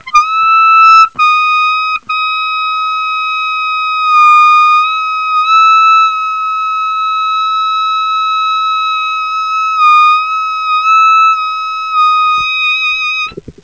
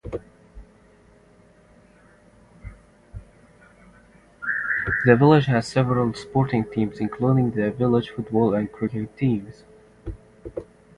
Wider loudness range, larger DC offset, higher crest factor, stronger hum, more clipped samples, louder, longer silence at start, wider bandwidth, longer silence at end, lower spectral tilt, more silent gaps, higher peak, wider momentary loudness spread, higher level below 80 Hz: second, 4 LU vs 9 LU; first, 0.4% vs under 0.1%; second, 10 dB vs 24 dB; neither; first, 0.3% vs under 0.1%; first, -9 LUFS vs -22 LUFS; about the same, 0.05 s vs 0.05 s; second, 8 kHz vs 11 kHz; second, 0.1 s vs 0.35 s; second, 0.5 dB/octave vs -8 dB/octave; neither; about the same, 0 dBFS vs 0 dBFS; second, 9 LU vs 23 LU; second, -54 dBFS vs -48 dBFS